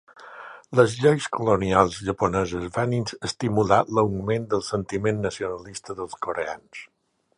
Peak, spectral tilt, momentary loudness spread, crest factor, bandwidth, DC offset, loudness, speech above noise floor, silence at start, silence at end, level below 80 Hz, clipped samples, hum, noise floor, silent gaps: -2 dBFS; -6 dB/octave; 16 LU; 22 dB; 11 kHz; under 0.1%; -24 LUFS; 19 dB; 0.2 s; 0.5 s; -50 dBFS; under 0.1%; none; -43 dBFS; none